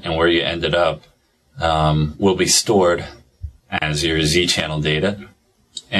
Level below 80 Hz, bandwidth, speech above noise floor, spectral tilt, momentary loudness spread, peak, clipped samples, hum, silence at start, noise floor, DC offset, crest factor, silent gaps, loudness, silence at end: -36 dBFS; 14 kHz; 21 dB; -4 dB/octave; 21 LU; 0 dBFS; under 0.1%; none; 0.05 s; -39 dBFS; under 0.1%; 18 dB; none; -18 LUFS; 0 s